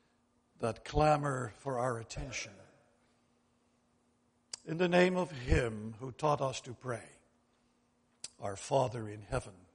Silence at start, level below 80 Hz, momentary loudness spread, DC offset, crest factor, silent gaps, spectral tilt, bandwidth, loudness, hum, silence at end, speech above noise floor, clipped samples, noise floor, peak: 0.6 s; -48 dBFS; 15 LU; under 0.1%; 22 dB; none; -5.5 dB/octave; 10.5 kHz; -35 LUFS; none; 0.2 s; 40 dB; under 0.1%; -74 dBFS; -14 dBFS